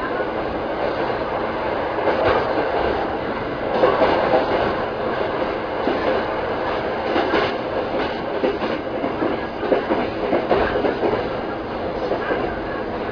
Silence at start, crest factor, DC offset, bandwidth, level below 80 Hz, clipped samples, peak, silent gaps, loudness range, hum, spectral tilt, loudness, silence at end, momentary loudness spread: 0 s; 16 dB; under 0.1%; 5.4 kHz; -42 dBFS; under 0.1%; -4 dBFS; none; 2 LU; none; -7 dB/octave; -22 LUFS; 0 s; 6 LU